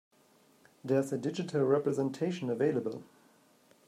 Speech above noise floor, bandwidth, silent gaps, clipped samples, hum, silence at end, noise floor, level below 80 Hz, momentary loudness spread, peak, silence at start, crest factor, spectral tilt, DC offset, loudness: 34 dB; 15 kHz; none; under 0.1%; none; 0.85 s; -65 dBFS; -82 dBFS; 10 LU; -14 dBFS; 0.85 s; 18 dB; -7 dB/octave; under 0.1%; -32 LUFS